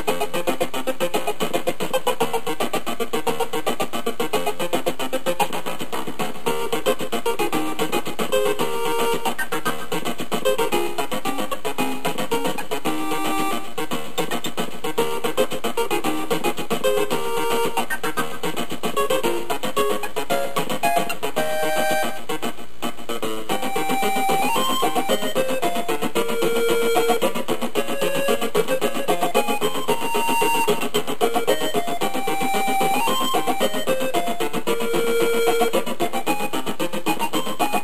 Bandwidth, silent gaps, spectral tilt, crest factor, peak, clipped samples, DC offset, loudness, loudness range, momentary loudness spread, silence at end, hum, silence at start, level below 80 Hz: 15.5 kHz; none; -3 dB/octave; 18 dB; -4 dBFS; under 0.1%; 7%; -23 LUFS; 3 LU; 6 LU; 0 s; none; 0 s; -54 dBFS